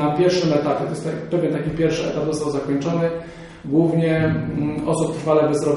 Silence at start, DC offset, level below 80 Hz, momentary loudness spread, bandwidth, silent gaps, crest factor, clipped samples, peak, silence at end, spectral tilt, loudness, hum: 0 s; under 0.1%; -46 dBFS; 7 LU; 11.5 kHz; none; 16 dB; under 0.1%; -4 dBFS; 0 s; -6.5 dB/octave; -21 LUFS; none